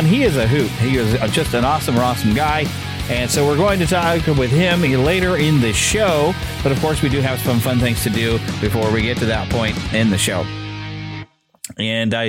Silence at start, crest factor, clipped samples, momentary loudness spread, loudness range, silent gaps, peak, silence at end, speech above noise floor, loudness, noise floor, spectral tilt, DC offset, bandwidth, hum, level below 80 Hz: 0 s; 14 dB; under 0.1%; 8 LU; 4 LU; none; -4 dBFS; 0 s; 21 dB; -17 LUFS; -37 dBFS; -5 dB/octave; under 0.1%; 16.5 kHz; none; -32 dBFS